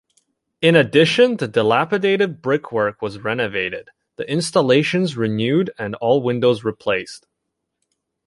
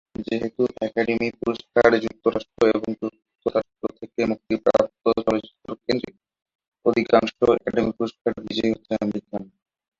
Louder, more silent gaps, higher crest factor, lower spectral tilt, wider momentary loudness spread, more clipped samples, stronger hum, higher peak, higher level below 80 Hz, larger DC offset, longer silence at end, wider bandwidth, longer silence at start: first, -18 LUFS vs -23 LUFS; second, none vs 6.55-6.59 s, 6.68-6.72 s, 8.21-8.25 s; about the same, 18 dB vs 22 dB; about the same, -5.5 dB/octave vs -6.5 dB/octave; second, 9 LU vs 12 LU; neither; neither; about the same, -2 dBFS vs -2 dBFS; about the same, -58 dBFS vs -54 dBFS; neither; first, 1.1 s vs 0.55 s; first, 11.5 kHz vs 7.6 kHz; first, 0.6 s vs 0.2 s